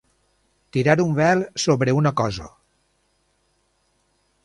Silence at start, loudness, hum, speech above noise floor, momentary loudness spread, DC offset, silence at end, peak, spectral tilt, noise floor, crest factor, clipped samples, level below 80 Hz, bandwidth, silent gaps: 0.75 s; -20 LUFS; none; 47 dB; 8 LU; under 0.1%; 1.95 s; -2 dBFS; -6 dB/octave; -67 dBFS; 22 dB; under 0.1%; -52 dBFS; 11.5 kHz; none